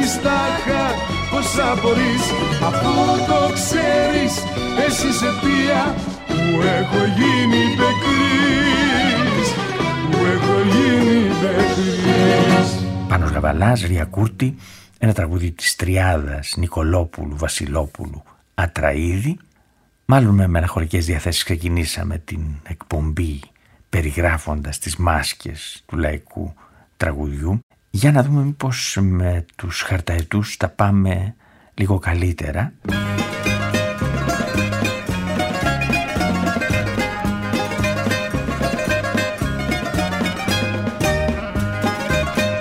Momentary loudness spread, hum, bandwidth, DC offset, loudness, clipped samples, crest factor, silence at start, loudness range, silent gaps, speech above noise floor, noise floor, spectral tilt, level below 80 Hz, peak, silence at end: 9 LU; none; 16 kHz; under 0.1%; -19 LUFS; under 0.1%; 18 dB; 0 s; 6 LU; 27.63-27.70 s; 41 dB; -59 dBFS; -5 dB/octave; -32 dBFS; 0 dBFS; 0 s